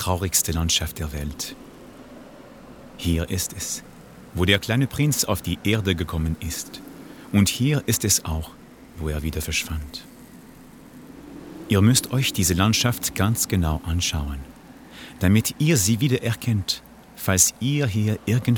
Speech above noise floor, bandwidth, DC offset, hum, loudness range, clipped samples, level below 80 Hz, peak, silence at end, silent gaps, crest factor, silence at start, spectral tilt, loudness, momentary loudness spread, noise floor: 23 dB; over 20 kHz; under 0.1%; none; 6 LU; under 0.1%; -40 dBFS; -2 dBFS; 0 s; none; 22 dB; 0 s; -4 dB/octave; -22 LUFS; 20 LU; -45 dBFS